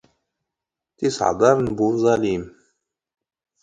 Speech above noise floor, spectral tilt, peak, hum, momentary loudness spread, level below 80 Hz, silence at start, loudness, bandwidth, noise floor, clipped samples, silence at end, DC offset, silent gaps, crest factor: 67 dB; -6 dB/octave; -2 dBFS; none; 9 LU; -52 dBFS; 1 s; -20 LUFS; 9.4 kHz; -86 dBFS; under 0.1%; 1.15 s; under 0.1%; none; 22 dB